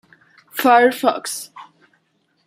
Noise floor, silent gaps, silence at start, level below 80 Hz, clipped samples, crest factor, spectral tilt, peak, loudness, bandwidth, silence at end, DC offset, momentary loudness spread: -65 dBFS; none; 0.55 s; -72 dBFS; under 0.1%; 18 dB; -2.5 dB/octave; -2 dBFS; -16 LUFS; 16 kHz; 0.85 s; under 0.1%; 17 LU